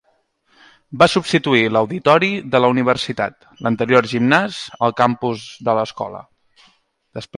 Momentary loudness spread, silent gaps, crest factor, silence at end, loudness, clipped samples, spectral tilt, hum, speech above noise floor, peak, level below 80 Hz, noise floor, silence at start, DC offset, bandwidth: 12 LU; none; 18 dB; 0.15 s; -17 LUFS; under 0.1%; -5.5 dB/octave; none; 46 dB; 0 dBFS; -56 dBFS; -63 dBFS; 0.9 s; under 0.1%; 11.5 kHz